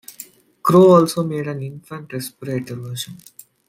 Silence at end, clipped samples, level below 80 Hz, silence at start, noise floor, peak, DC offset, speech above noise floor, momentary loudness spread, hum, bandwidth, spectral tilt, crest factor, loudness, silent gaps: 0.55 s; under 0.1%; -62 dBFS; 0.1 s; -42 dBFS; -2 dBFS; under 0.1%; 25 dB; 23 LU; none; 16 kHz; -6.5 dB/octave; 18 dB; -17 LUFS; none